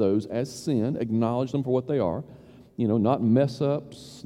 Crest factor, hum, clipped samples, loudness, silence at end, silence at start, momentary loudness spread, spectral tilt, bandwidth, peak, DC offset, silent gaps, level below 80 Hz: 16 dB; none; under 0.1%; -26 LUFS; 0.05 s; 0 s; 10 LU; -8 dB/octave; 12.5 kHz; -8 dBFS; under 0.1%; none; -60 dBFS